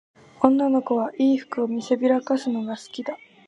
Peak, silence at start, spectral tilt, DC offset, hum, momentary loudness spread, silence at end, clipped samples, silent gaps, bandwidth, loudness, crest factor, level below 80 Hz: -2 dBFS; 0.4 s; -6 dB/octave; under 0.1%; none; 12 LU; 0.3 s; under 0.1%; none; 8.6 kHz; -23 LUFS; 22 dB; -68 dBFS